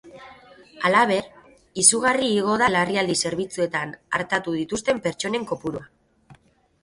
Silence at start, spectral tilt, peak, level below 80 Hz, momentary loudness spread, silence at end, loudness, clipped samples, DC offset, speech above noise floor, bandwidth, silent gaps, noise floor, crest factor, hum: 0.05 s; -2.5 dB/octave; -2 dBFS; -58 dBFS; 12 LU; 0.5 s; -22 LUFS; under 0.1%; under 0.1%; 34 dB; 11.5 kHz; none; -56 dBFS; 22 dB; none